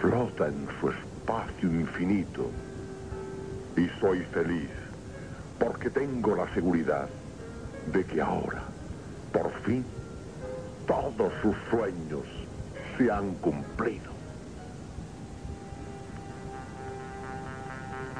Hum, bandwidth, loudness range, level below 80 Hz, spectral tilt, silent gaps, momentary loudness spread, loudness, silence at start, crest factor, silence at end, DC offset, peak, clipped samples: none; 10.5 kHz; 8 LU; -48 dBFS; -7.5 dB/octave; none; 14 LU; -32 LUFS; 0 s; 20 dB; 0 s; 0.1%; -12 dBFS; under 0.1%